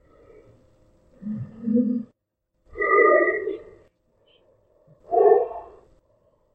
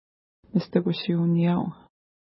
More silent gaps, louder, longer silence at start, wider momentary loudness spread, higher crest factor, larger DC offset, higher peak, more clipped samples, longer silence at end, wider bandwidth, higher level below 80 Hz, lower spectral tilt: neither; first, -21 LUFS vs -25 LUFS; first, 1.2 s vs 0.55 s; first, 22 LU vs 7 LU; about the same, 20 dB vs 18 dB; neither; first, -4 dBFS vs -8 dBFS; neither; first, 0.9 s vs 0.5 s; second, 3.7 kHz vs 5.8 kHz; about the same, -60 dBFS vs -64 dBFS; second, -10 dB/octave vs -11.5 dB/octave